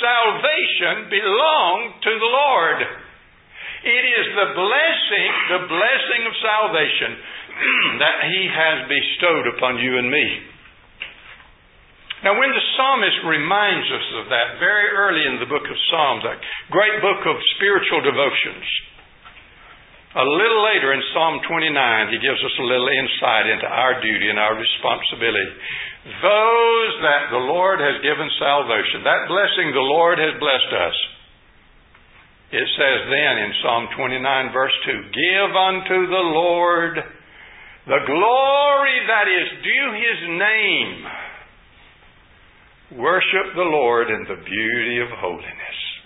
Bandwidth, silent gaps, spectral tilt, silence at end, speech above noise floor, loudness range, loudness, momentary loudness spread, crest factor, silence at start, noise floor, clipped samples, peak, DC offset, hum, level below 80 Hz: 4 kHz; none; -8 dB/octave; 0.05 s; 32 dB; 3 LU; -18 LUFS; 9 LU; 20 dB; 0 s; -51 dBFS; under 0.1%; 0 dBFS; under 0.1%; none; -58 dBFS